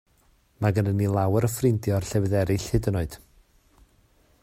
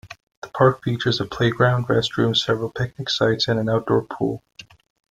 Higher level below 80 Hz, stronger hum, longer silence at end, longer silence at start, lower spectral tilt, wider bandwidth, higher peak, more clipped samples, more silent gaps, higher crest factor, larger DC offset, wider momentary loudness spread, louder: first, -44 dBFS vs -52 dBFS; neither; first, 1.25 s vs 0.55 s; first, 0.6 s vs 0.05 s; about the same, -7 dB/octave vs -6 dB/octave; first, 16 kHz vs 9.2 kHz; second, -8 dBFS vs -2 dBFS; neither; second, none vs 0.23-0.27 s, 0.37-0.42 s; about the same, 18 dB vs 20 dB; neither; about the same, 6 LU vs 8 LU; second, -25 LUFS vs -21 LUFS